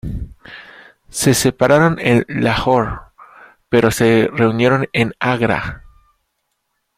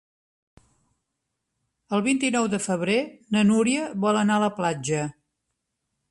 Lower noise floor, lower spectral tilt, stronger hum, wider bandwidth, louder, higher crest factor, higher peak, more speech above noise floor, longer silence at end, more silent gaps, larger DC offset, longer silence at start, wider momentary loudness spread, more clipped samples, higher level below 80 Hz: second, -71 dBFS vs -80 dBFS; about the same, -5 dB/octave vs -5 dB/octave; neither; first, 16.5 kHz vs 11.5 kHz; first, -15 LUFS vs -24 LUFS; about the same, 16 dB vs 16 dB; first, 0 dBFS vs -8 dBFS; about the same, 56 dB vs 57 dB; first, 1.15 s vs 1 s; neither; neither; second, 0.05 s vs 1.9 s; first, 17 LU vs 7 LU; neither; first, -38 dBFS vs -64 dBFS